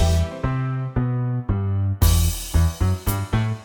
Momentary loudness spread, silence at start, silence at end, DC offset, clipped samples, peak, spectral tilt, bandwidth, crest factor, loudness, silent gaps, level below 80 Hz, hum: 6 LU; 0 s; 0 s; under 0.1%; under 0.1%; -4 dBFS; -5.5 dB/octave; over 20 kHz; 18 dB; -22 LUFS; none; -26 dBFS; none